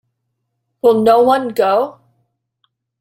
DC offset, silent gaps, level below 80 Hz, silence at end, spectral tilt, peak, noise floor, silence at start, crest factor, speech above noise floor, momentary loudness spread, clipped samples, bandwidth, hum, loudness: under 0.1%; none; -58 dBFS; 1.1 s; -5.5 dB/octave; 0 dBFS; -72 dBFS; 0.85 s; 16 dB; 60 dB; 7 LU; under 0.1%; 16 kHz; none; -14 LUFS